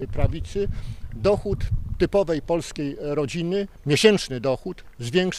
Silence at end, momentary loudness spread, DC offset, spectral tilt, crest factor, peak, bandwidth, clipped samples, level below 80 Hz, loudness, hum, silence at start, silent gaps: 0 s; 12 LU; under 0.1%; -5.5 dB/octave; 22 dB; -2 dBFS; 14 kHz; under 0.1%; -34 dBFS; -24 LUFS; none; 0 s; none